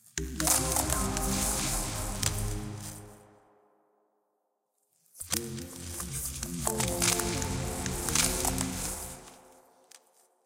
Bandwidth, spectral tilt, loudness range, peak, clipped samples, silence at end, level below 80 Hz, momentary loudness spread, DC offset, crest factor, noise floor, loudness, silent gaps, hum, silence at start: 16.5 kHz; -3 dB/octave; 10 LU; -6 dBFS; under 0.1%; 0.5 s; -42 dBFS; 14 LU; under 0.1%; 26 dB; -79 dBFS; -30 LUFS; none; none; 0.05 s